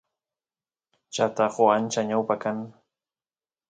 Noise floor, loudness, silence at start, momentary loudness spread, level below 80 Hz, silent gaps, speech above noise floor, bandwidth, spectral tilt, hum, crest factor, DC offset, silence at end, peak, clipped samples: under -90 dBFS; -24 LUFS; 1.1 s; 14 LU; -74 dBFS; none; over 66 dB; 9.4 kHz; -4.5 dB/octave; none; 22 dB; under 0.1%; 1 s; -6 dBFS; under 0.1%